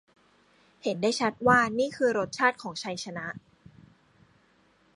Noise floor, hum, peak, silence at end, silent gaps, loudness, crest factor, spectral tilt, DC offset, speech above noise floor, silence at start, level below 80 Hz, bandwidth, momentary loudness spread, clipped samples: -64 dBFS; none; -8 dBFS; 1.55 s; none; -27 LUFS; 22 dB; -4 dB/octave; under 0.1%; 37 dB; 0.85 s; -64 dBFS; 11.5 kHz; 14 LU; under 0.1%